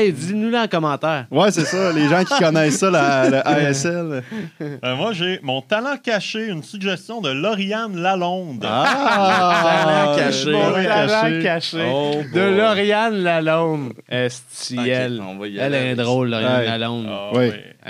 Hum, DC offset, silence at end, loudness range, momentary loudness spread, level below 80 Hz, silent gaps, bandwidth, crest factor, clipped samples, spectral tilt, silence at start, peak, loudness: none; under 0.1%; 0 s; 6 LU; 10 LU; -70 dBFS; none; 15 kHz; 16 dB; under 0.1%; -5 dB/octave; 0 s; -2 dBFS; -18 LUFS